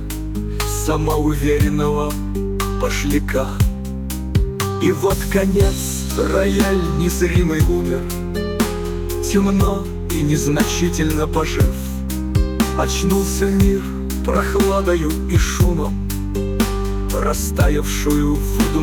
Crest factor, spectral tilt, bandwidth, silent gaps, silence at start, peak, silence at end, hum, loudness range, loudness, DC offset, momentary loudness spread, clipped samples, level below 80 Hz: 14 dB; -5.5 dB/octave; 19.5 kHz; none; 0 s; -4 dBFS; 0 s; none; 2 LU; -19 LUFS; under 0.1%; 7 LU; under 0.1%; -24 dBFS